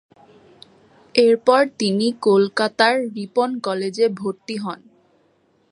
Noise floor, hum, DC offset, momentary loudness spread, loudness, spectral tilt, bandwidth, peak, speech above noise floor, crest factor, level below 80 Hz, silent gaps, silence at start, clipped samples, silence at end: -61 dBFS; none; under 0.1%; 12 LU; -19 LUFS; -5 dB/octave; 11.5 kHz; -2 dBFS; 42 dB; 20 dB; -72 dBFS; none; 1.15 s; under 0.1%; 0.95 s